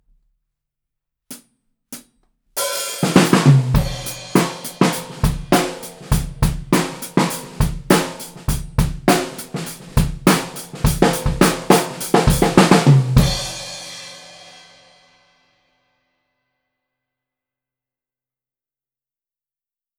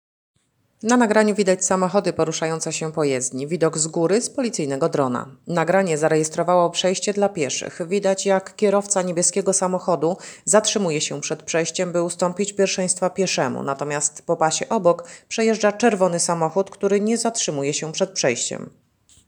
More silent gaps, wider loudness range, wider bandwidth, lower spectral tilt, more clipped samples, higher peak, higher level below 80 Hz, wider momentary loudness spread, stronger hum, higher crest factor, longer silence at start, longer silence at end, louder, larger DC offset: neither; first, 6 LU vs 2 LU; about the same, over 20 kHz vs over 20 kHz; first, -5 dB/octave vs -3.5 dB/octave; neither; about the same, 0 dBFS vs -2 dBFS; first, -30 dBFS vs -68 dBFS; first, 19 LU vs 6 LU; neither; about the same, 20 dB vs 20 dB; first, 1.3 s vs 0.85 s; first, 5.7 s vs 0.6 s; first, -18 LUFS vs -21 LUFS; neither